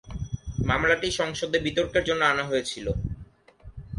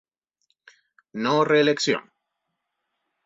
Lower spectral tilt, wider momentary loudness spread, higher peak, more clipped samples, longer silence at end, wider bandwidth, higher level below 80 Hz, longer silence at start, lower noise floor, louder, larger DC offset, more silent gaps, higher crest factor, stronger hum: about the same, -4.5 dB/octave vs -4.5 dB/octave; first, 13 LU vs 10 LU; about the same, -8 dBFS vs -6 dBFS; neither; second, 0 s vs 1.25 s; first, 11.5 kHz vs 7.8 kHz; first, -40 dBFS vs -72 dBFS; second, 0.05 s vs 1.15 s; second, -49 dBFS vs -80 dBFS; second, -26 LUFS vs -22 LUFS; neither; neither; about the same, 20 dB vs 20 dB; neither